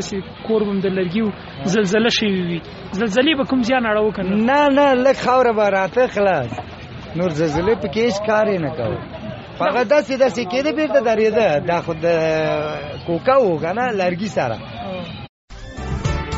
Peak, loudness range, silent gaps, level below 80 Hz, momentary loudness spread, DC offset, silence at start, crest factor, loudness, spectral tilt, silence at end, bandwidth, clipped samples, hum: -4 dBFS; 5 LU; 15.29-15.48 s; -40 dBFS; 13 LU; under 0.1%; 0 s; 16 dB; -18 LUFS; -4 dB/octave; 0 s; 8 kHz; under 0.1%; none